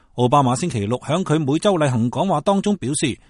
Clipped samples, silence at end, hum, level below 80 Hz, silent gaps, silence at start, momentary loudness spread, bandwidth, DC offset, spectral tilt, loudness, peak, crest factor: under 0.1%; 0.15 s; none; -50 dBFS; none; 0.15 s; 5 LU; 11.5 kHz; under 0.1%; -6 dB/octave; -19 LUFS; -2 dBFS; 16 dB